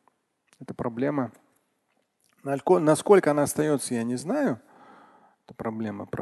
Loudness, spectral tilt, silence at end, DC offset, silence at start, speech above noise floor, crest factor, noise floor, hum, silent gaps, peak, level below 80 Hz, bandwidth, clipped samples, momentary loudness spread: -25 LUFS; -6 dB/octave; 0 s; under 0.1%; 0.6 s; 48 dB; 22 dB; -73 dBFS; none; none; -4 dBFS; -64 dBFS; 12.5 kHz; under 0.1%; 16 LU